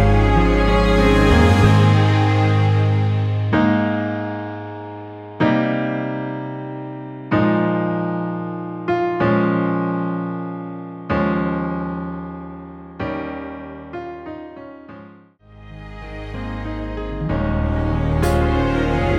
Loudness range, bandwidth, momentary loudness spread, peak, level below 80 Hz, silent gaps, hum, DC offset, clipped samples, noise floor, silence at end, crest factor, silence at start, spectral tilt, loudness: 16 LU; 11 kHz; 19 LU; -2 dBFS; -28 dBFS; none; none; under 0.1%; under 0.1%; -45 dBFS; 0 s; 18 dB; 0 s; -7.5 dB/octave; -19 LUFS